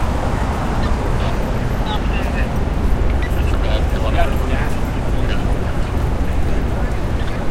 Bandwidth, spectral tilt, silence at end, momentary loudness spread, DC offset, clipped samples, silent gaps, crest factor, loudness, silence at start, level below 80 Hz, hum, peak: 15 kHz; -6.5 dB/octave; 0 s; 3 LU; under 0.1%; under 0.1%; none; 16 dB; -20 LUFS; 0 s; -20 dBFS; none; -2 dBFS